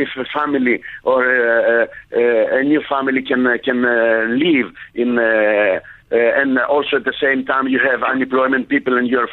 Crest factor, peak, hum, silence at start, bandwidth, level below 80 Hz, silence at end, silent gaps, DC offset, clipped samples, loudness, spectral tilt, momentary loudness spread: 12 dB; -4 dBFS; none; 0 s; 4.2 kHz; -56 dBFS; 0 s; none; under 0.1%; under 0.1%; -16 LUFS; -7.5 dB/octave; 5 LU